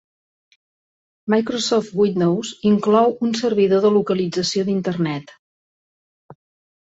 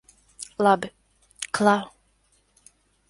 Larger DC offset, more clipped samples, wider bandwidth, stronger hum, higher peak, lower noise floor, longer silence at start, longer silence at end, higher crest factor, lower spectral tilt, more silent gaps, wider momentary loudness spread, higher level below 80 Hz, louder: neither; neither; second, 8 kHz vs 11.5 kHz; neither; about the same, -4 dBFS vs -4 dBFS; first, under -90 dBFS vs -65 dBFS; first, 1.25 s vs 0.4 s; second, 0.5 s vs 1.2 s; second, 16 dB vs 22 dB; about the same, -5.5 dB/octave vs -4.5 dB/octave; first, 5.39-6.29 s vs none; second, 6 LU vs 18 LU; about the same, -62 dBFS vs -64 dBFS; first, -19 LUFS vs -23 LUFS